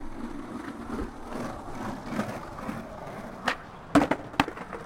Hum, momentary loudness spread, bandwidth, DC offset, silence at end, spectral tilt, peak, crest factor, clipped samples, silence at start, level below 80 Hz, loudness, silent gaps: none; 14 LU; 16.5 kHz; under 0.1%; 0 s; -5.5 dB/octave; -6 dBFS; 26 dB; under 0.1%; 0 s; -46 dBFS; -32 LUFS; none